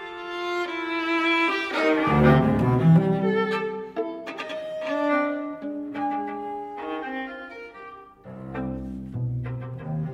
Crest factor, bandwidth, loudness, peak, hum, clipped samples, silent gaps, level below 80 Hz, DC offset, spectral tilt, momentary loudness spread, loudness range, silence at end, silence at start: 20 dB; 8.4 kHz; -25 LUFS; -6 dBFS; none; under 0.1%; none; -46 dBFS; under 0.1%; -7.5 dB/octave; 17 LU; 12 LU; 0 s; 0 s